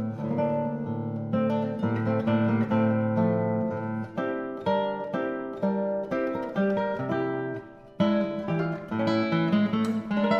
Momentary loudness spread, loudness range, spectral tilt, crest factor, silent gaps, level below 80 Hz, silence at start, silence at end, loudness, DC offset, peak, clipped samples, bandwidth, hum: 7 LU; 3 LU; -8.5 dB/octave; 16 dB; none; -62 dBFS; 0 s; 0 s; -27 LUFS; under 0.1%; -12 dBFS; under 0.1%; 8.4 kHz; none